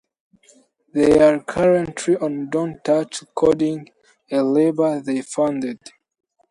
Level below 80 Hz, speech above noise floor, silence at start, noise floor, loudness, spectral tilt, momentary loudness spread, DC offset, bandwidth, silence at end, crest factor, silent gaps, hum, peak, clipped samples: -52 dBFS; 37 dB; 0.95 s; -55 dBFS; -19 LUFS; -6 dB/octave; 12 LU; under 0.1%; 11.5 kHz; 0.75 s; 18 dB; none; none; -2 dBFS; under 0.1%